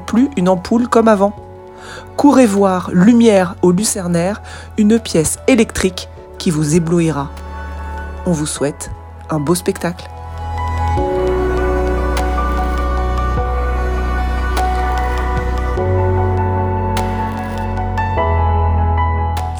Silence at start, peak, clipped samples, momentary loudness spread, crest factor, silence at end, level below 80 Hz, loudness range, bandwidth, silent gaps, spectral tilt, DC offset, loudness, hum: 0 s; 0 dBFS; under 0.1%; 15 LU; 16 dB; 0 s; -22 dBFS; 6 LU; over 20 kHz; none; -6 dB/octave; under 0.1%; -16 LUFS; none